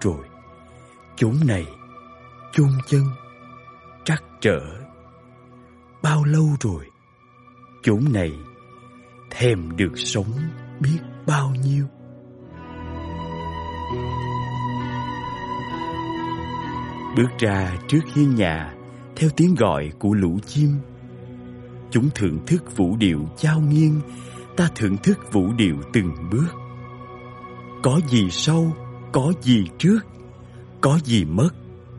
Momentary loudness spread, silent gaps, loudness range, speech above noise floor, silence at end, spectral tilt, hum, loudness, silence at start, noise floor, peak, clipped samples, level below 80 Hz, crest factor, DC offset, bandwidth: 20 LU; none; 7 LU; 33 dB; 0 s; -6.5 dB/octave; none; -22 LUFS; 0 s; -53 dBFS; -4 dBFS; under 0.1%; -46 dBFS; 18 dB; under 0.1%; 11.5 kHz